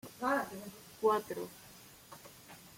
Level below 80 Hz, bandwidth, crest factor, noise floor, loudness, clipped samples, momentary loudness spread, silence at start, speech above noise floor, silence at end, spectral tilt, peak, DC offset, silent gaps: -74 dBFS; 16.5 kHz; 20 dB; -55 dBFS; -35 LUFS; under 0.1%; 21 LU; 0.05 s; 21 dB; 0 s; -4 dB/octave; -18 dBFS; under 0.1%; none